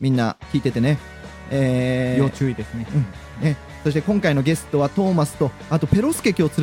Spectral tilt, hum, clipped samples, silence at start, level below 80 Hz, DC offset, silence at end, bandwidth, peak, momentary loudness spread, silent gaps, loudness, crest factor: -7 dB/octave; none; under 0.1%; 0 s; -44 dBFS; under 0.1%; 0 s; 17 kHz; -4 dBFS; 6 LU; none; -21 LUFS; 16 dB